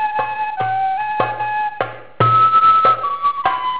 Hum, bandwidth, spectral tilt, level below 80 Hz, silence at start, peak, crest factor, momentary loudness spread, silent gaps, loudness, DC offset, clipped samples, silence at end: none; 4 kHz; -8 dB/octave; -54 dBFS; 0 s; -4 dBFS; 12 dB; 11 LU; none; -16 LUFS; 0.9%; under 0.1%; 0 s